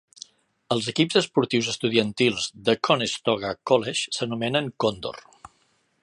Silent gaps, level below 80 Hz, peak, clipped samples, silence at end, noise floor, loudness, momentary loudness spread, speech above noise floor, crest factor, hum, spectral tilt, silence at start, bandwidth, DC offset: none; -62 dBFS; -4 dBFS; under 0.1%; 0.8 s; -67 dBFS; -24 LUFS; 13 LU; 43 dB; 20 dB; none; -4 dB/octave; 0.7 s; 11.5 kHz; under 0.1%